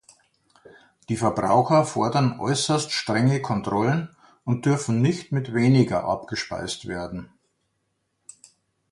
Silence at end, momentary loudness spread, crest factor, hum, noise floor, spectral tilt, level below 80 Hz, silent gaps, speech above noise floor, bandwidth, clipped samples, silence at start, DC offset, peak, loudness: 1.7 s; 12 LU; 18 dB; none; -74 dBFS; -5.5 dB/octave; -56 dBFS; none; 52 dB; 11.5 kHz; under 0.1%; 1.1 s; under 0.1%; -6 dBFS; -23 LUFS